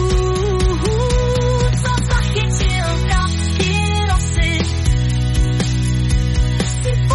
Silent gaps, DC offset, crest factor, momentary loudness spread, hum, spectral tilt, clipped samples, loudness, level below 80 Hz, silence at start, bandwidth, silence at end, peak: none; under 0.1%; 12 dB; 1 LU; none; -5 dB/octave; under 0.1%; -17 LUFS; -20 dBFS; 0 s; 11.5 kHz; 0 s; -4 dBFS